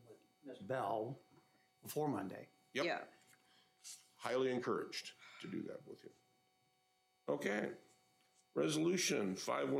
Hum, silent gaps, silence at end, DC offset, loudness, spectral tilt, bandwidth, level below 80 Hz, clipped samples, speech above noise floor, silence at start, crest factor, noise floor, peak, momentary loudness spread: none; none; 0 s; under 0.1%; -41 LUFS; -4 dB/octave; 16 kHz; under -90 dBFS; under 0.1%; 39 dB; 0.1 s; 18 dB; -79 dBFS; -24 dBFS; 20 LU